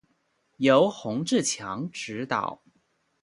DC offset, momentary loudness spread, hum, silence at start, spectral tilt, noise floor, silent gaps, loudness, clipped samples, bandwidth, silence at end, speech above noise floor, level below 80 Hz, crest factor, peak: under 0.1%; 13 LU; none; 0.6 s; -4 dB/octave; -71 dBFS; none; -26 LUFS; under 0.1%; 11.5 kHz; 0.7 s; 46 dB; -68 dBFS; 22 dB; -6 dBFS